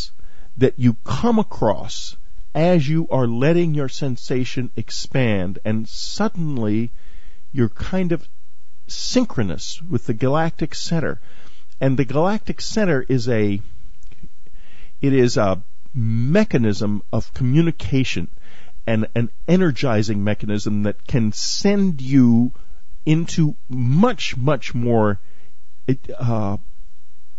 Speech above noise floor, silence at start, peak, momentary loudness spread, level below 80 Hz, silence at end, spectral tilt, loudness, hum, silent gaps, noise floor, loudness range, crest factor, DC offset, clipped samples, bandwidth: 39 dB; 0 s; -2 dBFS; 10 LU; -42 dBFS; 0.5 s; -6.5 dB/octave; -21 LUFS; none; none; -58 dBFS; 5 LU; 20 dB; 10%; under 0.1%; 8 kHz